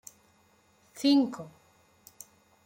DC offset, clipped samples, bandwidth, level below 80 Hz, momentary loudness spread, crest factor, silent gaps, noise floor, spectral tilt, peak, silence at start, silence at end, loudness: under 0.1%; under 0.1%; 16.5 kHz; -78 dBFS; 26 LU; 18 dB; none; -65 dBFS; -4 dB/octave; -14 dBFS; 0.95 s; 1.2 s; -27 LUFS